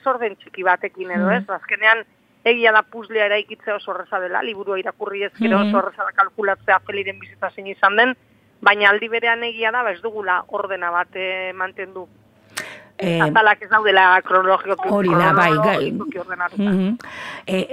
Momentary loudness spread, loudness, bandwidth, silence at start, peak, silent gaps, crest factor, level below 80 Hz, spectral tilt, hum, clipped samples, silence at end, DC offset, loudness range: 14 LU; -18 LUFS; 15.5 kHz; 0.05 s; 0 dBFS; none; 20 dB; -64 dBFS; -5.5 dB/octave; none; under 0.1%; 0 s; under 0.1%; 6 LU